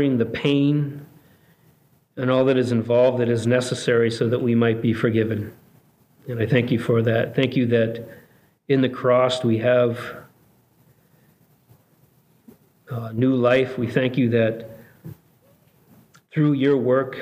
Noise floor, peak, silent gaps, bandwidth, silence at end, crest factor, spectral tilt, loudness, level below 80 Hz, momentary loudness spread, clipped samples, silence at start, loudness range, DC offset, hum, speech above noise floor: -59 dBFS; -4 dBFS; none; 15.5 kHz; 0 s; 18 dB; -7 dB/octave; -21 LUFS; -64 dBFS; 17 LU; under 0.1%; 0 s; 5 LU; under 0.1%; none; 39 dB